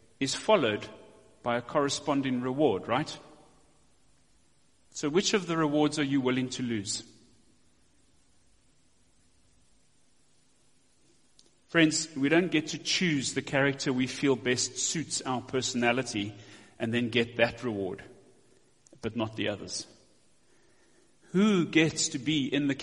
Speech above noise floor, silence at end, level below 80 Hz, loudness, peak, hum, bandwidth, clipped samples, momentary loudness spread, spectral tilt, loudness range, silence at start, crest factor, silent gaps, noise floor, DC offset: 40 dB; 0 s; -66 dBFS; -29 LUFS; -8 dBFS; none; 11.5 kHz; under 0.1%; 12 LU; -4 dB/octave; 9 LU; 0.2 s; 22 dB; none; -68 dBFS; under 0.1%